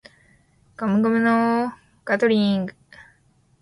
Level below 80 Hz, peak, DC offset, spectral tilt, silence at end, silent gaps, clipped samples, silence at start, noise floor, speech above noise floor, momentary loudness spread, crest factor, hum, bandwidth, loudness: -62 dBFS; -8 dBFS; under 0.1%; -7 dB/octave; 0.9 s; none; under 0.1%; 0.8 s; -60 dBFS; 41 dB; 11 LU; 14 dB; none; 11 kHz; -21 LUFS